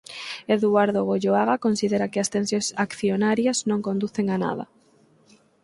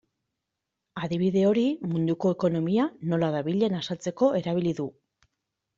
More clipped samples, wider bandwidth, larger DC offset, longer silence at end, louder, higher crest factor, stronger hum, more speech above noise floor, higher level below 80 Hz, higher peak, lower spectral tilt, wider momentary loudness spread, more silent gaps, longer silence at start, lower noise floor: neither; first, 11.5 kHz vs 7.6 kHz; neither; about the same, 1 s vs 0.9 s; first, -23 LUFS vs -26 LUFS; about the same, 18 dB vs 18 dB; neither; second, 36 dB vs 59 dB; about the same, -66 dBFS vs -66 dBFS; first, -6 dBFS vs -10 dBFS; second, -5 dB/octave vs -7.5 dB/octave; about the same, 7 LU vs 9 LU; neither; second, 0.1 s vs 0.95 s; second, -59 dBFS vs -84 dBFS